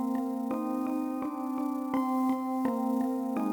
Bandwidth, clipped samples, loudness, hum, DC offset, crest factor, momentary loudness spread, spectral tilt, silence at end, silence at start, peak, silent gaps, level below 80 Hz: 19.5 kHz; under 0.1%; -31 LUFS; none; under 0.1%; 14 dB; 4 LU; -6.5 dB/octave; 0 s; 0 s; -16 dBFS; none; -74 dBFS